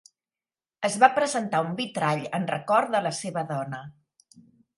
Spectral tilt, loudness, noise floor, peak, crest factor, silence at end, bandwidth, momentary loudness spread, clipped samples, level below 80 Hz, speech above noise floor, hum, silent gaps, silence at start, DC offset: -4.5 dB/octave; -25 LUFS; under -90 dBFS; -2 dBFS; 24 dB; 0.85 s; 11.5 kHz; 11 LU; under 0.1%; -74 dBFS; over 65 dB; none; none; 0.8 s; under 0.1%